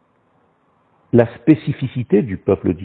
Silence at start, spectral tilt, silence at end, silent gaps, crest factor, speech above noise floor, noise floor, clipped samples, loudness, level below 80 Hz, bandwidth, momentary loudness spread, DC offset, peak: 1.15 s; -11 dB/octave; 0 s; none; 18 dB; 43 dB; -59 dBFS; under 0.1%; -17 LUFS; -50 dBFS; 4.4 kHz; 6 LU; under 0.1%; 0 dBFS